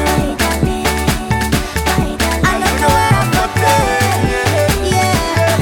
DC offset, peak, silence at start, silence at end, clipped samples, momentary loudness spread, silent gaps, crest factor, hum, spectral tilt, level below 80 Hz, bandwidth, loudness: under 0.1%; 0 dBFS; 0 s; 0 s; under 0.1%; 4 LU; none; 14 dB; none; -4.5 dB/octave; -24 dBFS; 17.5 kHz; -14 LUFS